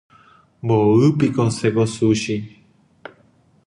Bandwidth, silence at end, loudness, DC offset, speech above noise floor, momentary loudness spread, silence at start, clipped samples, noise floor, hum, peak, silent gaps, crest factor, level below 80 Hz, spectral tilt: 11 kHz; 1.2 s; -18 LUFS; under 0.1%; 39 dB; 13 LU; 0.65 s; under 0.1%; -56 dBFS; none; -4 dBFS; none; 16 dB; -54 dBFS; -7 dB/octave